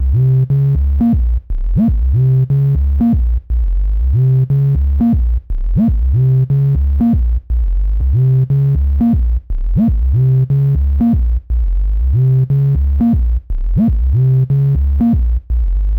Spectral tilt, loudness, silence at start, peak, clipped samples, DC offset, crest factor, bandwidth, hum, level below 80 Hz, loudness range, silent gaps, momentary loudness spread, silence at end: -12.5 dB/octave; -14 LUFS; 0 s; -8 dBFS; under 0.1%; under 0.1%; 4 dB; 2.5 kHz; none; -16 dBFS; 1 LU; none; 6 LU; 0 s